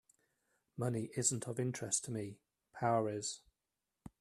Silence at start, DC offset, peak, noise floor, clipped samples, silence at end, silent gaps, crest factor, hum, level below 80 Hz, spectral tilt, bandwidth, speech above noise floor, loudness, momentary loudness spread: 0.75 s; under 0.1%; -20 dBFS; -90 dBFS; under 0.1%; 0.15 s; none; 20 dB; none; -74 dBFS; -4.5 dB/octave; 13.5 kHz; 52 dB; -38 LUFS; 15 LU